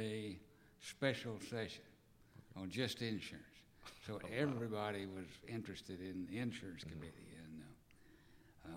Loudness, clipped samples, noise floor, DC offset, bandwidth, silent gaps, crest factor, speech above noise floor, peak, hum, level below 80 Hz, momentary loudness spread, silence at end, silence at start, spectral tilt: -46 LUFS; under 0.1%; -66 dBFS; under 0.1%; 16.5 kHz; none; 24 dB; 21 dB; -22 dBFS; none; -72 dBFS; 17 LU; 0 s; 0 s; -5.5 dB/octave